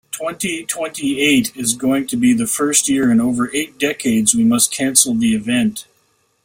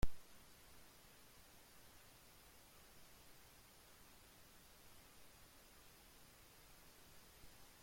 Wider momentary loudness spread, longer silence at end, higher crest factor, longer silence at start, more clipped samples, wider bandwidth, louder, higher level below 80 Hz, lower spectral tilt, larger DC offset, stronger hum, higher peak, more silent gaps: first, 9 LU vs 1 LU; first, 0.65 s vs 0 s; second, 16 dB vs 26 dB; first, 0.15 s vs 0 s; neither; about the same, 16.5 kHz vs 16.5 kHz; first, -16 LUFS vs -63 LUFS; first, -54 dBFS vs -60 dBFS; about the same, -3 dB/octave vs -4 dB/octave; neither; neither; first, 0 dBFS vs -24 dBFS; neither